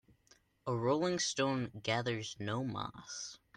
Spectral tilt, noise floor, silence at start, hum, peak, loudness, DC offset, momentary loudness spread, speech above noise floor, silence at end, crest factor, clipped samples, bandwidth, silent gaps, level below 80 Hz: -4 dB/octave; -69 dBFS; 0.65 s; none; -20 dBFS; -36 LUFS; under 0.1%; 11 LU; 33 dB; 0.2 s; 18 dB; under 0.1%; 10.5 kHz; none; -70 dBFS